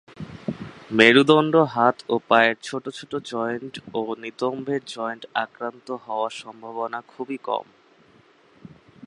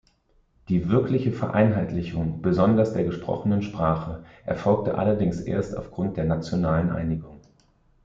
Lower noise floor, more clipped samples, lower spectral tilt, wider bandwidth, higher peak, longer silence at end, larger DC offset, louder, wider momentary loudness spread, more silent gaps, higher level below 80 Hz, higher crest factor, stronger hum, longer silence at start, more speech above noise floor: second, -56 dBFS vs -63 dBFS; neither; second, -5 dB/octave vs -9 dB/octave; first, 11 kHz vs 7.6 kHz; first, 0 dBFS vs -6 dBFS; second, 0.4 s vs 0.65 s; neither; first, -22 LUFS vs -25 LUFS; first, 17 LU vs 8 LU; neither; second, -66 dBFS vs -46 dBFS; first, 24 dB vs 18 dB; neither; second, 0.2 s vs 0.7 s; second, 33 dB vs 40 dB